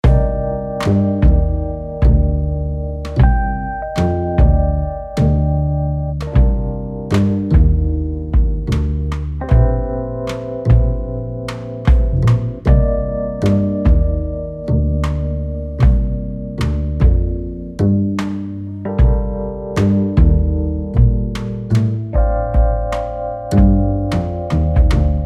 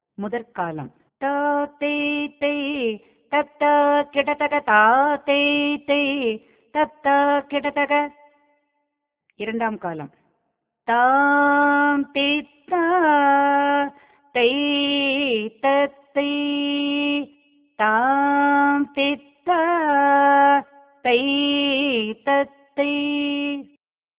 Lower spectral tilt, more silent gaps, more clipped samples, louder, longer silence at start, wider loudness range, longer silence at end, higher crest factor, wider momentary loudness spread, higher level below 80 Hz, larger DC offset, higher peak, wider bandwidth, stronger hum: first, -9 dB/octave vs -7.5 dB/octave; neither; neither; first, -17 LUFS vs -20 LUFS; second, 0.05 s vs 0.2 s; second, 2 LU vs 5 LU; second, 0 s vs 0.55 s; about the same, 14 dB vs 18 dB; second, 9 LU vs 12 LU; first, -18 dBFS vs -66 dBFS; neither; about the same, -2 dBFS vs -2 dBFS; first, 7.6 kHz vs 4 kHz; neither